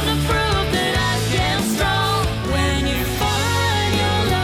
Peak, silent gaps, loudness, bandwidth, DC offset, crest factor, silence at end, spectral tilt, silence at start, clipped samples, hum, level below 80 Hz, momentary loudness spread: -10 dBFS; none; -19 LUFS; 16 kHz; under 0.1%; 10 dB; 0 s; -4.5 dB/octave; 0 s; under 0.1%; none; -28 dBFS; 2 LU